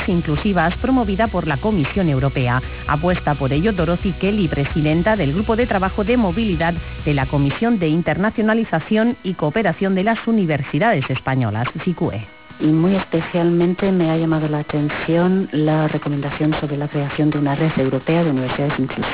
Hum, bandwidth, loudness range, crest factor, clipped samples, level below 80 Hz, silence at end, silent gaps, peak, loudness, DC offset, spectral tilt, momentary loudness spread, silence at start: none; 4 kHz; 1 LU; 12 dB; under 0.1%; -34 dBFS; 0 s; none; -6 dBFS; -19 LUFS; 0.4%; -11.5 dB/octave; 4 LU; 0 s